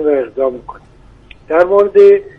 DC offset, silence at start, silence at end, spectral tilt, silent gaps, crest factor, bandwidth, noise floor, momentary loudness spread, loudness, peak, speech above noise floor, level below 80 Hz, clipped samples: under 0.1%; 0 s; 0.1 s; -7 dB/octave; none; 12 dB; 5 kHz; -40 dBFS; 11 LU; -11 LUFS; 0 dBFS; 29 dB; -46 dBFS; under 0.1%